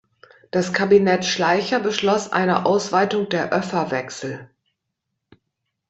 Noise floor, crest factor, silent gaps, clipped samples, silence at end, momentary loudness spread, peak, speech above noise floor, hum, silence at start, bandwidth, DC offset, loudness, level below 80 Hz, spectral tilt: -79 dBFS; 18 dB; none; under 0.1%; 1.45 s; 10 LU; -2 dBFS; 59 dB; none; 0.55 s; 8.2 kHz; under 0.1%; -20 LUFS; -62 dBFS; -4.5 dB/octave